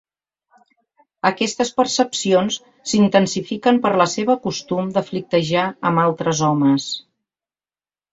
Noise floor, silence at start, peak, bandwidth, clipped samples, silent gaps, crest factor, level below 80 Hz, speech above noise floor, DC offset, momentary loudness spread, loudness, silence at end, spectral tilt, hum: under -90 dBFS; 1.25 s; -2 dBFS; 8 kHz; under 0.1%; none; 18 dB; -60 dBFS; over 72 dB; under 0.1%; 7 LU; -19 LUFS; 1.15 s; -4.5 dB/octave; none